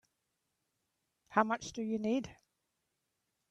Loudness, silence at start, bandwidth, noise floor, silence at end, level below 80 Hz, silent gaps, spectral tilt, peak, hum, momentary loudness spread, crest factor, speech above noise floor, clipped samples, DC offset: -35 LUFS; 1.3 s; 9 kHz; -84 dBFS; 1.15 s; -72 dBFS; none; -5 dB/octave; -12 dBFS; none; 6 LU; 26 dB; 50 dB; under 0.1%; under 0.1%